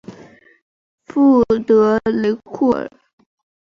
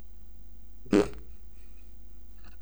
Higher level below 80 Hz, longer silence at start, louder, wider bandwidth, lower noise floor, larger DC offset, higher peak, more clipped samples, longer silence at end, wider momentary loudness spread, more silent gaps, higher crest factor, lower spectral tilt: about the same, -52 dBFS vs -50 dBFS; second, 0.1 s vs 0.5 s; first, -16 LUFS vs -28 LUFS; second, 7 kHz vs over 20 kHz; second, -44 dBFS vs -50 dBFS; second, under 0.1% vs 1%; first, -4 dBFS vs -10 dBFS; neither; first, 0.9 s vs 0.1 s; second, 10 LU vs 26 LU; first, 0.62-0.98 s vs none; second, 14 dB vs 24 dB; first, -8 dB/octave vs -6.5 dB/octave